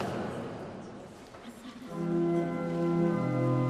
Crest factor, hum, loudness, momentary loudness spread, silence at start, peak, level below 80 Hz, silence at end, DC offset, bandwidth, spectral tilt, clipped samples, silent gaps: 14 dB; none; -31 LUFS; 18 LU; 0 s; -18 dBFS; -62 dBFS; 0 s; under 0.1%; 12 kHz; -8.5 dB/octave; under 0.1%; none